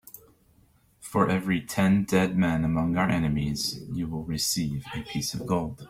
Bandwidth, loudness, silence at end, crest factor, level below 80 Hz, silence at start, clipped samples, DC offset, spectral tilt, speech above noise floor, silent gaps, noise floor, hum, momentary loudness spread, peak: 16.5 kHz; -27 LUFS; 0 s; 18 dB; -50 dBFS; 0.15 s; under 0.1%; under 0.1%; -5 dB/octave; 36 dB; none; -62 dBFS; none; 9 LU; -10 dBFS